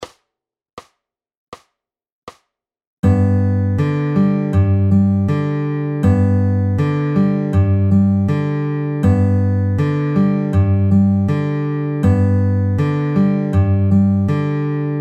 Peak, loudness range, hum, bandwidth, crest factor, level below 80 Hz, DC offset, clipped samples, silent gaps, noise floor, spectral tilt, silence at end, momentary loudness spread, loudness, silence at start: -4 dBFS; 3 LU; none; 4.9 kHz; 12 dB; -42 dBFS; under 0.1%; under 0.1%; 0.73-0.77 s, 1.37-1.52 s, 2.12-2.27 s, 2.87-3.03 s; -84 dBFS; -10 dB/octave; 0 s; 5 LU; -16 LUFS; 0 s